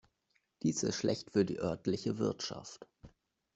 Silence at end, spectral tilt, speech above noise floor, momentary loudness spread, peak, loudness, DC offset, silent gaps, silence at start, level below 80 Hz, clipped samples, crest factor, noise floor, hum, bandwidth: 0.45 s; -5 dB/octave; 44 dB; 12 LU; -18 dBFS; -35 LUFS; under 0.1%; none; 0.65 s; -68 dBFS; under 0.1%; 20 dB; -79 dBFS; none; 8.2 kHz